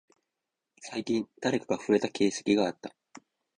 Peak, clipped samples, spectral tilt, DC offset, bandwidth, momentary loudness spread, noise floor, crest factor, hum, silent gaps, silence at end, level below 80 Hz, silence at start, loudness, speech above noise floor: -12 dBFS; under 0.1%; -4.5 dB/octave; under 0.1%; 10 kHz; 17 LU; -87 dBFS; 20 dB; none; none; 0.7 s; -68 dBFS; 0.8 s; -29 LUFS; 58 dB